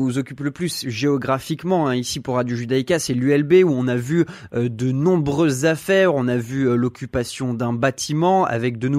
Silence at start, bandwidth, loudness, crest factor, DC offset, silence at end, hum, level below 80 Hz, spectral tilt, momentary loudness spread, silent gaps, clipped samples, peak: 0 s; 15 kHz; -20 LUFS; 16 dB; under 0.1%; 0 s; none; -52 dBFS; -6 dB/octave; 8 LU; none; under 0.1%; -4 dBFS